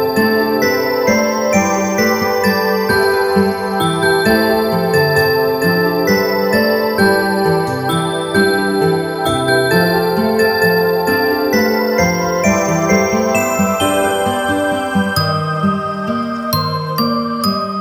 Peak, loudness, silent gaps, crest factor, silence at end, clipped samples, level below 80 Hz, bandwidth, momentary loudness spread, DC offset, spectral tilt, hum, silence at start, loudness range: -2 dBFS; -14 LUFS; none; 14 dB; 0 s; under 0.1%; -44 dBFS; 19.5 kHz; 4 LU; under 0.1%; -5 dB/octave; none; 0 s; 2 LU